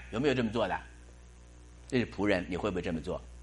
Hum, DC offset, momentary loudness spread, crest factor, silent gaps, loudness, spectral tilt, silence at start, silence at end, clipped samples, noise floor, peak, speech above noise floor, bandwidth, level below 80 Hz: 60 Hz at -50 dBFS; under 0.1%; 10 LU; 20 dB; none; -32 LUFS; -6 dB/octave; 0 s; 0 s; under 0.1%; -53 dBFS; -14 dBFS; 21 dB; 11.5 kHz; -50 dBFS